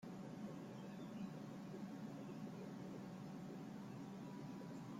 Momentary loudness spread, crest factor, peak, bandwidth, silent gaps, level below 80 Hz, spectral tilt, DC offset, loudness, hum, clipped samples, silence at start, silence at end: 2 LU; 12 dB; -38 dBFS; 16 kHz; none; -82 dBFS; -7 dB/octave; under 0.1%; -52 LUFS; none; under 0.1%; 0 s; 0 s